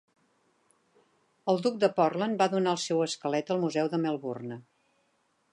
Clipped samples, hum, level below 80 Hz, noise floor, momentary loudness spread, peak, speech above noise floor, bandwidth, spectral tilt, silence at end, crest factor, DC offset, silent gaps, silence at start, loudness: under 0.1%; none; -82 dBFS; -72 dBFS; 11 LU; -10 dBFS; 44 dB; 11.5 kHz; -5 dB/octave; 0.9 s; 20 dB; under 0.1%; none; 1.45 s; -29 LUFS